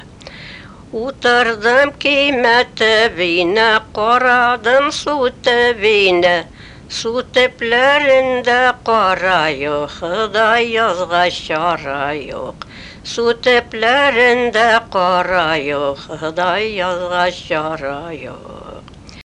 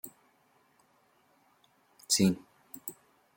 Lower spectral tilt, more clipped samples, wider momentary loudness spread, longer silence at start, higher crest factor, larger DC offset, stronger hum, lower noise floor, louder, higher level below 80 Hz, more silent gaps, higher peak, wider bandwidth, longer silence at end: about the same, -3.5 dB/octave vs -4 dB/octave; neither; second, 15 LU vs 22 LU; about the same, 0 s vs 0.05 s; second, 14 dB vs 24 dB; neither; neither; second, -36 dBFS vs -68 dBFS; first, -14 LUFS vs -31 LUFS; first, -46 dBFS vs -72 dBFS; neither; first, -2 dBFS vs -14 dBFS; second, 10.5 kHz vs 17 kHz; second, 0 s vs 0.45 s